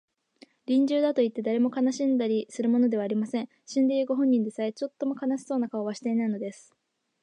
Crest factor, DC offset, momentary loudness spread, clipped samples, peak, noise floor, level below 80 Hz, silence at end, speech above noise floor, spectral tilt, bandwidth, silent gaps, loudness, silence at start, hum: 14 dB; under 0.1%; 8 LU; under 0.1%; -14 dBFS; -58 dBFS; -84 dBFS; 0.7 s; 32 dB; -6 dB/octave; 10 kHz; none; -27 LUFS; 0.7 s; none